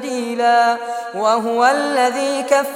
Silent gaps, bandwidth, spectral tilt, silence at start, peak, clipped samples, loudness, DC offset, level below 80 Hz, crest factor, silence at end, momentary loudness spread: none; 16.5 kHz; -2.5 dB/octave; 0 s; -2 dBFS; under 0.1%; -17 LUFS; under 0.1%; -68 dBFS; 14 dB; 0 s; 8 LU